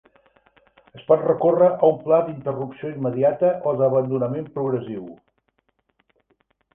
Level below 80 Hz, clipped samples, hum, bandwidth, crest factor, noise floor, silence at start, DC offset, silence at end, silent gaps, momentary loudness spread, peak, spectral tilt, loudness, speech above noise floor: -64 dBFS; under 0.1%; none; 3.5 kHz; 18 dB; -69 dBFS; 0.95 s; under 0.1%; 1.6 s; none; 13 LU; -4 dBFS; -11.5 dB/octave; -21 LUFS; 49 dB